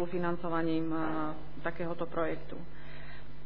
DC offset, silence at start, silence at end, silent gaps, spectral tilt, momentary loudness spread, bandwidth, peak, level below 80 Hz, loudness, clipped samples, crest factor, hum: 2%; 0 s; 0 s; none; -9.5 dB/octave; 16 LU; 5.2 kHz; -16 dBFS; -54 dBFS; -35 LUFS; under 0.1%; 18 dB; none